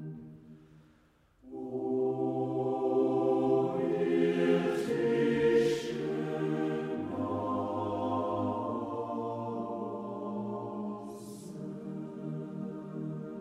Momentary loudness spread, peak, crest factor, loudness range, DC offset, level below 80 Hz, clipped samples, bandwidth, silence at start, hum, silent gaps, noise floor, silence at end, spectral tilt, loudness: 13 LU; -14 dBFS; 18 dB; 10 LU; under 0.1%; -68 dBFS; under 0.1%; 13 kHz; 0 s; none; none; -65 dBFS; 0 s; -7.5 dB/octave; -32 LUFS